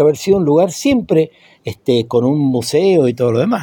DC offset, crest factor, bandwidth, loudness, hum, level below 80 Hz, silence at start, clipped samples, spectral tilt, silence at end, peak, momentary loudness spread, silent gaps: under 0.1%; 12 dB; 17.5 kHz; -14 LUFS; none; -50 dBFS; 0 s; under 0.1%; -6.5 dB/octave; 0 s; -2 dBFS; 9 LU; none